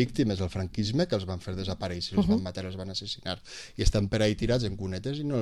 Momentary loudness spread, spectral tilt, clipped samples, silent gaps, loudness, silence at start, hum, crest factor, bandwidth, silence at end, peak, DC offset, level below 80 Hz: 9 LU; -6 dB/octave; under 0.1%; none; -30 LUFS; 0 s; none; 20 dB; 12.5 kHz; 0 s; -8 dBFS; 0.2%; -40 dBFS